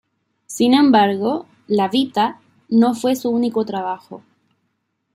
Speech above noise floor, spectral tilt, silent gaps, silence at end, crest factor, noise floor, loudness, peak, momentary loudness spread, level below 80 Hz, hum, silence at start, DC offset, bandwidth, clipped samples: 54 dB; -5 dB/octave; none; 0.95 s; 16 dB; -71 dBFS; -18 LUFS; -2 dBFS; 13 LU; -68 dBFS; none; 0.5 s; under 0.1%; 15.5 kHz; under 0.1%